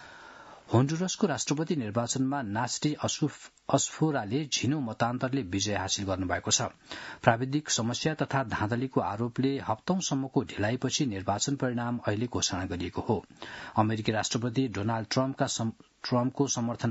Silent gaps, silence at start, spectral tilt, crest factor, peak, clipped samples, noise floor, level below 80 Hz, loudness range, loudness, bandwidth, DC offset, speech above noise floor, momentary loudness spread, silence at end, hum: none; 0 s; -4.5 dB/octave; 26 dB; -2 dBFS; under 0.1%; -50 dBFS; -64 dBFS; 2 LU; -30 LUFS; 8 kHz; under 0.1%; 20 dB; 6 LU; 0 s; none